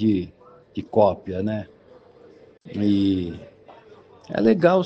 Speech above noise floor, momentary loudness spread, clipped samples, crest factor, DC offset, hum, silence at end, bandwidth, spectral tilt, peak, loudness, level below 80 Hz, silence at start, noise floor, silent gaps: 30 dB; 17 LU; under 0.1%; 20 dB; under 0.1%; none; 0 s; 6.4 kHz; -9 dB/octave; -4 dBFS; -22 LUFS; -56 dBFS; 0 s; -50 dBFS; none